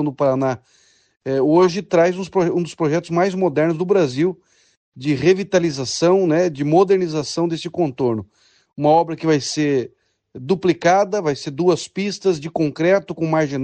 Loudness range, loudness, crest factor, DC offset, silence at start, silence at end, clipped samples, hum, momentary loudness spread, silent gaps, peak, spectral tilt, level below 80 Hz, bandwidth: 2 LU; -19 LUFS; 16 dB; under 0.1%; 0 s; 0 s; under 0.1%; none; 7 LU; 4.77-4.92 s; -2 dBFS; -6 dB/octave; -60 dBFS; 9.4 kHz